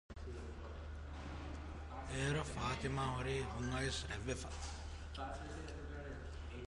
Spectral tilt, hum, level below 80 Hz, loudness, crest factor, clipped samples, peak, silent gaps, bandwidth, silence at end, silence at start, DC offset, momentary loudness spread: -5 dB/octave; none; -50 dBFS; -44 LUFS; 18 dB; under 0.1%; -26 dBFS; none; 11.5 kHz; 0 s; 0.1 s; under 0.1%; 10 LU